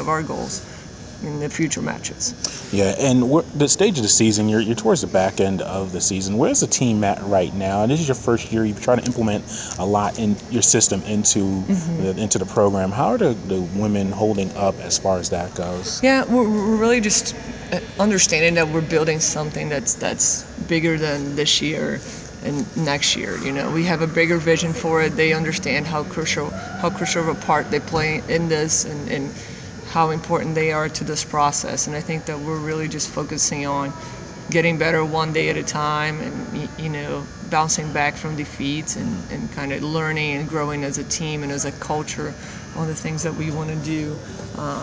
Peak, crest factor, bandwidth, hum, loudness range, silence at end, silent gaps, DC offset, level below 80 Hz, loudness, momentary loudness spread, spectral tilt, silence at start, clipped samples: -2 dBFS; 20 dB; 8 kHz; none; 6 LU; 0 s; none; under 0.1%; -44 dBFS; -20 LUFS; 11 LU; -4 dB/octave; 0 s; under 0.1%